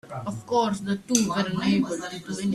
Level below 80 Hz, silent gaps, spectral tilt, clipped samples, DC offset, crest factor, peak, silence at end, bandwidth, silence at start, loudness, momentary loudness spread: -60 dBFS; none; -4.5 dB/octave; under 0.1%; under 0.1%; 22 dB; -4 dBFS; 0 s; 14 kHz; 0.05 s; -26 LUFS; 10 LU